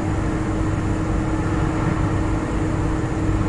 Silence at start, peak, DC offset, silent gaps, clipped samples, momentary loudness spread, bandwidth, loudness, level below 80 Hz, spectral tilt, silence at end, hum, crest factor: 0 s; -8 dBFS; under 0.1%; none; under 0.1%; 1 LU; 11 kHz; -22 LUFS; -28 dBFS; -7.5 dB/octave; 0 s; none; 12 dB